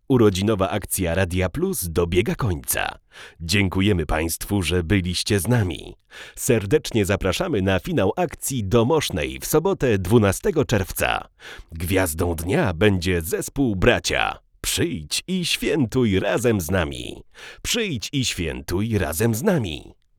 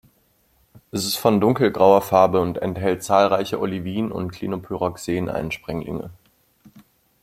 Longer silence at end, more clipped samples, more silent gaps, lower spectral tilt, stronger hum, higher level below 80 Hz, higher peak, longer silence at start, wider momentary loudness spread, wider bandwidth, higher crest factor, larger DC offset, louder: second, 0.25 s vs 0.45 s; neither; neither; about the same, -5 dB/octave vs -5.5 dB/octave; neither; first, -38 dBFS vs -54 dBFS; about the same, -2 dBFS vs -2 dBFS; second, 0.1 s vs 0.75 s; second, 9 LU vs 13 LU; first, 19.5 kHz vs 16.5 kHz; about the same, 20 dB vs 20 dB; neither; about the same, -22 LUFS vs -21 LUFS